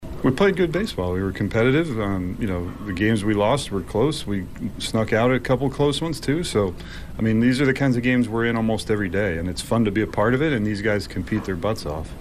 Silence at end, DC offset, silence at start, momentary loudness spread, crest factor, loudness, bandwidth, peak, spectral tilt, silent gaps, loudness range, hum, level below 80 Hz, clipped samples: 0 s; under 0.1%; 0 s; 8 LU; 14 dB; -22 LUFS; 15 kHz; -8 dBFS; -6 dB/octave; none; 2 LU; none; -40 dBFS; under 0.1%